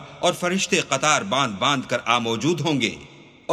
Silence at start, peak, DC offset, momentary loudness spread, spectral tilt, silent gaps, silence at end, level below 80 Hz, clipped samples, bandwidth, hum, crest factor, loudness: 0 s; -4 dBFS; under 0.1%; 5 LU; -3.5 dB/octave; none; 0 s; -60 dBFS; under 0.1%; 14.5 kHz; none; 20 dB; -21 LUFS